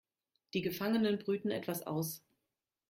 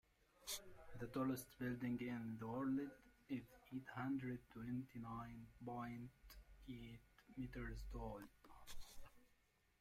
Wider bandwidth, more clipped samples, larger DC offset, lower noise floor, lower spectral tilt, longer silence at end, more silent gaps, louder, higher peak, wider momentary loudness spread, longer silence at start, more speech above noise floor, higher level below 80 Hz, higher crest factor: about the same, 16.5 kHz vs 16 kHz; neither; neither; first, -89 dBFS vs -79 dBFS; about the same, -5.5 dB/octave vs -5.5 dB/octave; first, 0.7 s vs 0.55 s; neither; first, -36 LUFS vs -50 LUFS; first, -22 dBFS vs -34 dBFS; second, 8 LU vs 17 LU; first, 0.55 s vs 0.4 s; first, 54 dB vs 30 dB; second, -74 dBFS vs -64 dBFS; about the same, 16 dB vs 16 dB